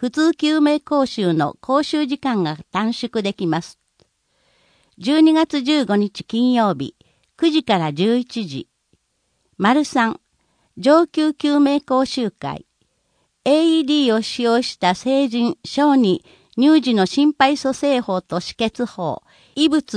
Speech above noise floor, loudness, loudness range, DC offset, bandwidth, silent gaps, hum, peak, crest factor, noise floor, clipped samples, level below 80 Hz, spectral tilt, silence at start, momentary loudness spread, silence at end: 51 dB; -18 LUFS; 4 LU; under 0.1%; 10.5 kHz; none; none; -2 dBFS; 18 dB; -68 dBFS; under 0.1%; -60 dBFS; -5.5 dB/octave; 0 s; 11 LU; 0 s